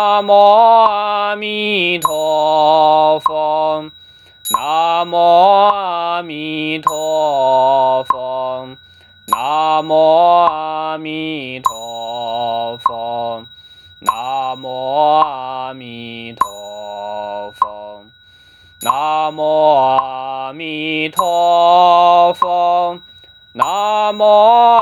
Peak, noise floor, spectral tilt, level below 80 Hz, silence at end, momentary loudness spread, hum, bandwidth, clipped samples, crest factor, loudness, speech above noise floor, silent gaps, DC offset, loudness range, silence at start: 0 dBFS; -46 dBFS; -3.5 dB/octave; -62 dBFS; 0 s; 15 LU; none; 19.5 kHz; under 0.1%; 14 dB; -14 LUFS; 34 dB; none; under 0.1%; 8 LU; 0 s